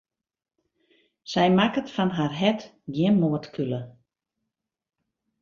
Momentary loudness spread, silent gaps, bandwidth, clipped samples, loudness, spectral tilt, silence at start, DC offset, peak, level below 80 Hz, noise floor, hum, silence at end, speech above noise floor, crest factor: 13 LU; none; 7.2 kHz; under 0.1%; -25 LUFS; -7 dB/octave; 1.25 s; under 0.1%; -6 dBFS; -64 dBFS; -84 dBFS; none; 1.5 s; 60 dB; 20 dB